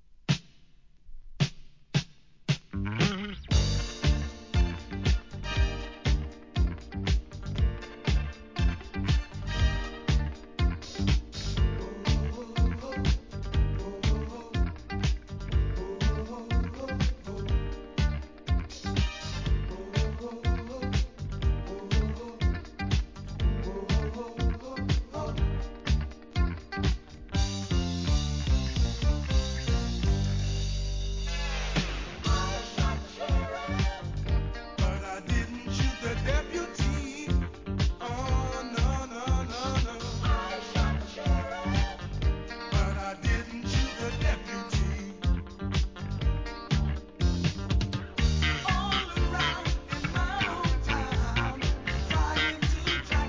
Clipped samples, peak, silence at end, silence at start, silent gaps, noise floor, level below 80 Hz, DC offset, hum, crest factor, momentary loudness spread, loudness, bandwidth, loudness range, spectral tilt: under 0.1%; -12 dBFS; 0 s; 0.3 s; none; -57 dBFS; -32 dBFS; 0.1%; none; 18 dB; 5 LU; -31 LUFS; 7.6 kHz; 3 LU; -5.5 dB/octave